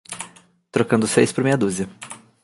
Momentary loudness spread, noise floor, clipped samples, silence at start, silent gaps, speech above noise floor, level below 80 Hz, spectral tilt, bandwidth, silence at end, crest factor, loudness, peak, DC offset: 19 LU; -48 dBFS; under 0.1%; 0.1 s; none; 28 dB; -58 dBFS; -5 dB/octave; 11.5 kHz; 0.25 s; 20 dB; -20 LUFS; -2 dBFS; under 0.1%